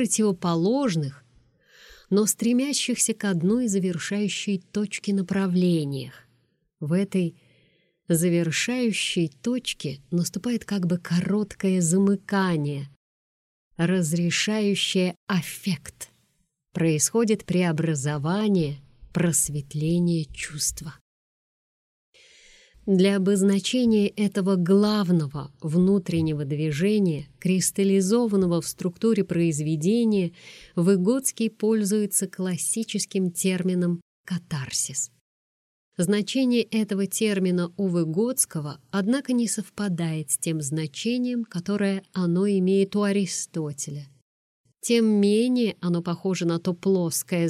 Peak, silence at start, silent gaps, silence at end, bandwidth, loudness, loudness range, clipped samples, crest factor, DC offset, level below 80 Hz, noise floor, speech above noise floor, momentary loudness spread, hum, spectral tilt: -8 dBFS; 0 s; 12.96-13.71 s, 15.17-15.27 s, 21.01-22.13 s, 34.02-34.24 s, 35.21-35.92 s, 44.22-44.64 s; 0 s; 15 kHz; -24 LUFS; 4 LU; under 0.1%; 16 dB; under 0.1%; -58 dBFS; -71 dBFS; 48 dB; 9 LU; none; -5 dB/octave